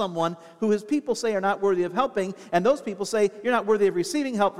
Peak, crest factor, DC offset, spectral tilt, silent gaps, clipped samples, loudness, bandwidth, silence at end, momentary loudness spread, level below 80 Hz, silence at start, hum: -8 dBFS; 16 dB; 0.2%; -5 dB/octave; none; under 0.1%; -25 LUFS; 14 kHz; 0 s; 5 LU; -64 dBFS; 0 s; none